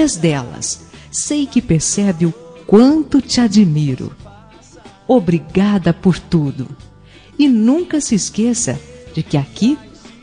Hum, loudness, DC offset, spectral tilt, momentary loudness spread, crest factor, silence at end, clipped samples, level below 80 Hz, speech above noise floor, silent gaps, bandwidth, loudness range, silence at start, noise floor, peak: none; -15 LUFS; under 0.1%; -5.5 dB/octave; 14 LU; 16 dB; 0.35 s; under 0.1%; -42 dBFS; 28 dB; none; 10 kHz; 3 LU; 0 s; -42 dBFS; 0 dBFS